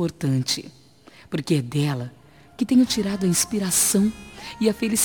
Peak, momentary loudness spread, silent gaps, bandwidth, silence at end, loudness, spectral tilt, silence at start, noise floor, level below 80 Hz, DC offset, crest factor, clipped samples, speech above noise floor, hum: -6 dBFS; 13 LU; none; over 20 kHz; 0 s; -22 LUFS; -4 dB/octave; 0 s; -50 dBFS; -54 dBFS; 0.1%; 16 dB; under 0.1%; 28 dB; none